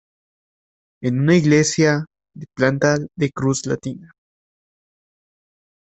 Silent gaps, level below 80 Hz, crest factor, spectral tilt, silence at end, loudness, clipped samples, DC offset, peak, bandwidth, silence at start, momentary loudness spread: none; -56 dBFS; 18 dB; -5.5 dB/octave; 1.8 s; -19 LUFS; under 0.1%; under 0.1%; -2 dBFS; 8.4 kHz; 1 s; 17 LU